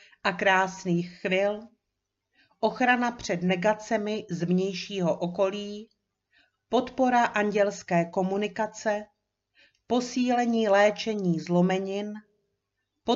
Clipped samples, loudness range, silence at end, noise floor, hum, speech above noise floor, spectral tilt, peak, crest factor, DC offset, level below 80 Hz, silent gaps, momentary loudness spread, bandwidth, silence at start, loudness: under 0.1%; 2 LU; 0 s; -83 dBFS; none; 57 dB; -5.5 dB/octave; -8 dBFS; 20 dB; under 0.1%; -66 dBFS; none; 9 LU; 7.6 kHz; 0.25 s; -26 LUFS